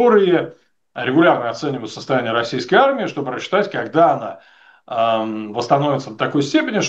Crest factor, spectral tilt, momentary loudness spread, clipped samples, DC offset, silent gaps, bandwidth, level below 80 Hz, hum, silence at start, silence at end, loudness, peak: 16 dB; -5.5 dB/octave; 11 LU; under 0.1%; under 0.1%; none; 8.2 kHz; -70 dBFS; none; 0 s; 0 s; -18 LUFS; 0 dBFS